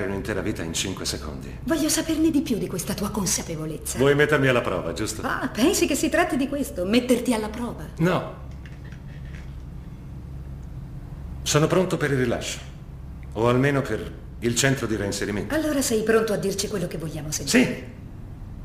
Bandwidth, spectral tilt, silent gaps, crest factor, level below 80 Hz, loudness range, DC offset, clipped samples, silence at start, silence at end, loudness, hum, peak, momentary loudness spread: 15.5 kHz; -4.5 dB/octave; none; 20 dB; -40 dBFS; 7 LU; under 0.1%; under 0.1%; 0 s; 0 s; -24 LUFS; none; -4 dBFS; 19 LU